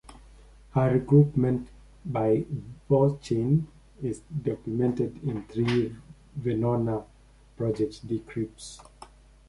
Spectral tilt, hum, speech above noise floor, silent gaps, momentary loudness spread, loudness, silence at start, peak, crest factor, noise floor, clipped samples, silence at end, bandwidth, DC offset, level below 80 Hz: -8.5 dB/octave; none; 25 dB; none; 14 LU; -27 LUFS; 0.1 s; -8 dBFS; 20 dB; -51 dBFS; under 0.1%; 0.45 s; 11.5 kHz; under 0.1%; -52 dBFS